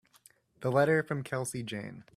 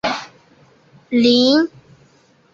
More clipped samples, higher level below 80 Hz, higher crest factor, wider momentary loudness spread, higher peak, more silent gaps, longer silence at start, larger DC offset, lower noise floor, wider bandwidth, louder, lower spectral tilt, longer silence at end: neither; second, -70 dBFS vs -60 dBFS; about the same, 20 dB vs 16 dB; about the same, 12 LU vs 12 LU; second, -12 dBFS vs -2 dBFS; neither; first, 0.6 s vs 0.05 s; neither; first, -63 dBFS vs -54 dBFS; first, 15 kHz vs 7.4 kHz; second, -31 LUFS vs -16 LUFS; first, -5.5 dB/octave vs -4 dB/octave; second, 0.15 s vs 0.85 s